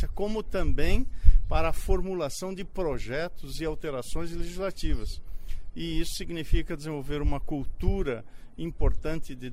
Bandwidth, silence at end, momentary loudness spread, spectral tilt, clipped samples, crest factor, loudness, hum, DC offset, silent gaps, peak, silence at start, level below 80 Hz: 13 kHz; 0 s; 9 LU; -6 dB/octave; under 0.1%; 22 dB; -32 LUFS; none; under 0.1%; none; -2 dBFS; 0 s; -28 dBFS